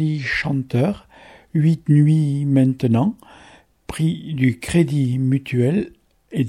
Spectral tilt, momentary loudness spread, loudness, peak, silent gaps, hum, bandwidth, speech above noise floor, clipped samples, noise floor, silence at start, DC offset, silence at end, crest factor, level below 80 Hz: -7.5 dB/octave; 9 LU; -19 LUFS; -4 dBFS; none; none; 12.5 kHz; 31 dB; under 0.1%; -49 dBFS; 0 s; under 0.1%; 0 s; 16 dB; -48 dBFS